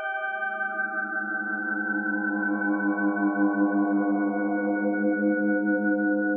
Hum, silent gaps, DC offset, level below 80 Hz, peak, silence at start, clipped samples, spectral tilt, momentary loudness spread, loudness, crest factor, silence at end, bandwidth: none; none; under 0.1%; under -90 dBFS; -12 dBFS; 0 s; under 0.1%; -11 dB/octave; 4 LU; -26 LUFS; 12 dB; 0 s; 3.3 kHz